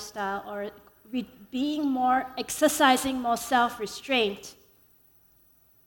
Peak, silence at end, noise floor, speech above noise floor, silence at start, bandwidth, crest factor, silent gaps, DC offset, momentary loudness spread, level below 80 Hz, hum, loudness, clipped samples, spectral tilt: -8 dBFS; 1.35 s; -61 dBFS; 34 dB; 0 s; 18 kHz; 20 dB; none; under 0.1%; 15 LU; -62 dBFS; none; -27 LUFS; under 0.1%; -2.5 dB/octave